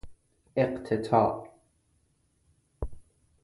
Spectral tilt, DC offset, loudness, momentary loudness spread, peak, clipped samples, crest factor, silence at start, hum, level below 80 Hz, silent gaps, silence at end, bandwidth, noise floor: -8 dB/octave; under 0.1%; -28 LUFS; 17 LU; -10 dBFS; under 0.1%; 22 dB; 0.05 s; none; -50 dBFS; none; 0.4 s; 11.5 kHz; -70 dBFS